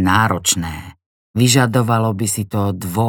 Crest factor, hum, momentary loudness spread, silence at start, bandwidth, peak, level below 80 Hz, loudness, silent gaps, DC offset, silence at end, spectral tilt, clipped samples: 16 dB; none; 11 LU; 0 s; 18.5 kHz; 0 dBFS; -48 dBFS; -16 LUFS; 1.06-1.34 s; under 0.1%; 0 s; -4.5 dB/octave; under 0.1%